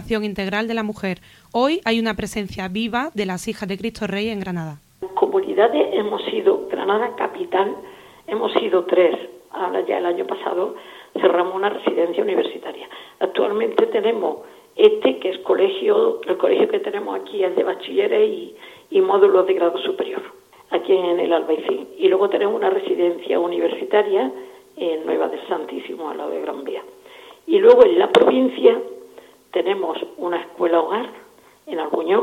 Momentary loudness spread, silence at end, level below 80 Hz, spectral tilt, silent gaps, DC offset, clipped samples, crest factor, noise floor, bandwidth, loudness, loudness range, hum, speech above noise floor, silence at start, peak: 14 LU; 0 s; -56 dBFS; -5.5 dB/octave; none; under 0.1%; under 0.1%; 20 dB; -45 dBFS; 14.5 kHz; -20 LUFS; 6 LU; none; 26 dB; 0 s; 0 dBFS